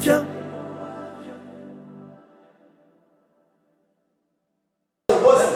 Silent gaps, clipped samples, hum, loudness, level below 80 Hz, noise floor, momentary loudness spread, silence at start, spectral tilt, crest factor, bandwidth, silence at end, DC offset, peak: none; under 0.1%; none; -22 LUFS; -64 dBFS; -78 dBFS; 26 LU; 0 s; -4.5 dB/octave; 22 dB; 16.5 kHz; 0 s; under 0.1%; -4 dBFS